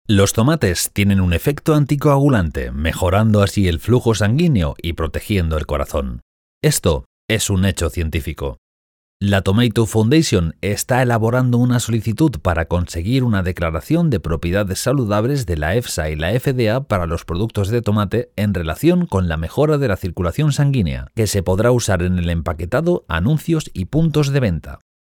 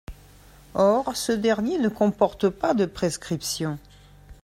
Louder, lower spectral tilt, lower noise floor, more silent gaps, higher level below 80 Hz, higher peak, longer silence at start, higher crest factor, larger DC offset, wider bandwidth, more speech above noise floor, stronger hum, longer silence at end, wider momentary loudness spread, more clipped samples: first, -18 LUFS vs -24 LUFS; about the same, -6 dB/octave vs -5 dB/octave; first, under -90 dBFS vs -50 dBFS; first, 6.22-6.61 s, 7.06-7.28 s, 8.58-9.20 s vs none; first, -34 dBFS vs -50 dBFS; about the same, -4 dBFS vs -6 dBFS; about the same, 0.1 s vs 0.1 s; second, 14 dB vs 20 dB; neither; first, 20 kHz vs 16 kHz; first, over 73 dB vs 27 dB; neither; first, 0.25 s vs 0.1 s; about the same, 7 LU vs 8 LU; neither